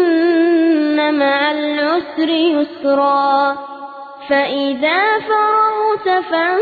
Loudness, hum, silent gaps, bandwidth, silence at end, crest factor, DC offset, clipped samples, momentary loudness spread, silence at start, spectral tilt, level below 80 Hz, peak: -15 LUFS; none; none; 4.8 kHz; 0 s; 12 dB; under 0.1%; under 0.1%; 5 LU; 0 s; -6 dB/octave; -64 dBFS; -4 dBFS